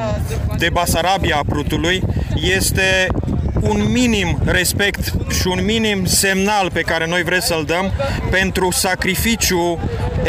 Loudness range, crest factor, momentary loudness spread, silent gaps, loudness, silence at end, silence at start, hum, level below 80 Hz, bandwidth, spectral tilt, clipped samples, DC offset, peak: 1 LU; 14 dB; 6 LU; none; -16 LUFS; 0 s; 0 s; none; -26 dBFS; 16 kHz; -4 dB/octave; under 0.1%; under 0.1%; -2 dBFS